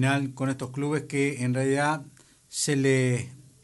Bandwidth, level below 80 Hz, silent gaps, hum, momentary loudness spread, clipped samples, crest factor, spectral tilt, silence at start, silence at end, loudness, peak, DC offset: 11.5 kHz; -66 dBFS; none; none; 8 LU; under 0.1%; 16 dB; -5 dB/octave; 0 s; 0.25 s; -27 LUFS; -12 dBFS; under 0.1%